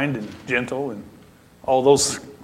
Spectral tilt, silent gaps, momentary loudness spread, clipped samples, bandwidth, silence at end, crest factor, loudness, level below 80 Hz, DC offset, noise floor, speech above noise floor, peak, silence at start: -3.5 dB/octave; none; 15 LU; under 0.1%; 16 kHz; 0 s; 20 dB; -21 LUFS; -54 dBFS; under 0.1%; -48 dBFS; 26 dB; -2 dBFS; 0 s